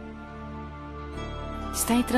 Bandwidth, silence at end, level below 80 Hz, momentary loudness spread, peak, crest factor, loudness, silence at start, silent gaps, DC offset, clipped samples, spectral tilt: 15 kHz; 0 s; -40 dBFS; 15 LU; -10 dBFS; 20 dB; -32 LUFS; 0 s; none; under 0.1%; under 0.1%; -4 dB/octave